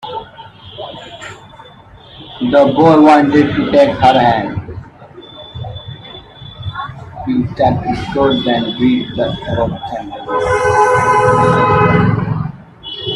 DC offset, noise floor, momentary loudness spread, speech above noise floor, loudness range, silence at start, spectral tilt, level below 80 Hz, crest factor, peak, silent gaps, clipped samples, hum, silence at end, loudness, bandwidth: under 0.1%; -39 dBFS; 22 LU; 27 dB; 9 LU; 0.05 s; -6.5 dB/octave; -40 dBFS; 14 dB; 0 dBFS; none; under 0.1%; none; 0 s; -12 LUFS; 11.5 kHz